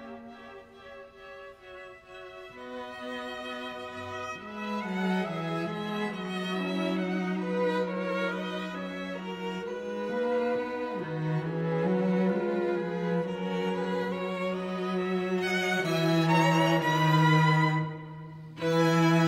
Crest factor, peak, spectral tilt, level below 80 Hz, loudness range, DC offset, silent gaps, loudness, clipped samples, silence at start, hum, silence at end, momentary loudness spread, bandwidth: 18 dB; -12 dBFS; -6.5 dB/octave; -68 dBFS; 14 LU; under 0.1%; none; -29 LUFS; under 0.1%; 0 s; none; 0 s; 21 LU; 15.5 kHz